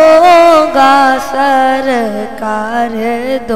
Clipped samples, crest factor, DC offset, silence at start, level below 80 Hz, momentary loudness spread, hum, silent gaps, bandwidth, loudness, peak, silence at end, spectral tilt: 0.7%; 10 dB; 3%; 0 s; -42 dBFS; 12 LU; none; none; 15.5 kHz; -9 LUFS; 0 dBFS; 0 s; -4 dB/octave